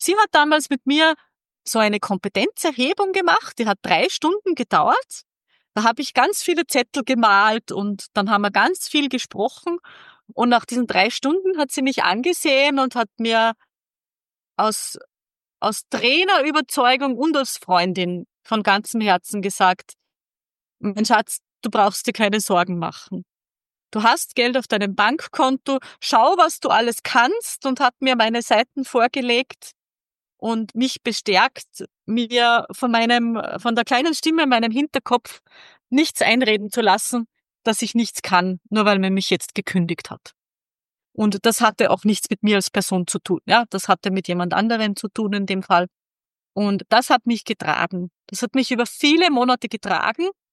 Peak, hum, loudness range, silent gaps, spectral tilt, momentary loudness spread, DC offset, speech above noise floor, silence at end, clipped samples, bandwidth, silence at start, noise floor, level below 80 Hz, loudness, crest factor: -2 dBFS; none; 3 LU; none; -3.5 dB/octave; 10 LU; under 0.1%; over 70 dB; 0.2 s; under 0.1%; 13 kHz; 0 s; under -90 dBFS; -70 dBFS; -19 LUFS; 18 dB